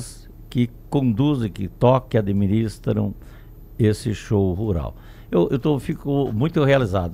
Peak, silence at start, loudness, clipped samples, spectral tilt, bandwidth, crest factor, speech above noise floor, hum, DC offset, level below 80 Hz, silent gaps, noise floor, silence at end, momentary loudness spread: -2 dBFS; 0 s; -21 LUFS; under 0.1%; -8 dB/octave; 15 kHz; 18 dB; 19 dB; none; under 0.1%; -40 dBFS; none; -39 dBFS; 0 s; 9 LU